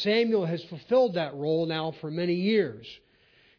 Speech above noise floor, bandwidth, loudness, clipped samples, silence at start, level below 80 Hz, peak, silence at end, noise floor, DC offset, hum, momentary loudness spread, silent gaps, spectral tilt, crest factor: 35 dB; 5.4 kHz; -27 LUFS; under 0.1%; 0 s; -70 dBFS; -14 dBFS; 0.65 s; -62 dBFS; under 0.1%; none; 10 LU; none; -7.5 dB/octave; 14 dB